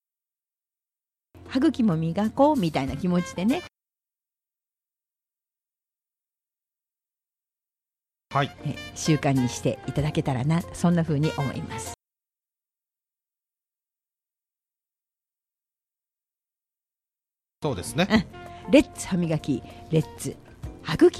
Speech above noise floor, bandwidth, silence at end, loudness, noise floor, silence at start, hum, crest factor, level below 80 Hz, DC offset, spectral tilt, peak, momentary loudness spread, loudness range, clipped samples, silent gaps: over 66 dB; 14 kHz; 0 s; -25 LUFS; under -90 dBFS; 1.35 s; none; 24 dB; -52 dBFS; under 0.1%; -6 dB/octave; -4 dBFS; 14 LU; 11 LU; under 0.1%; none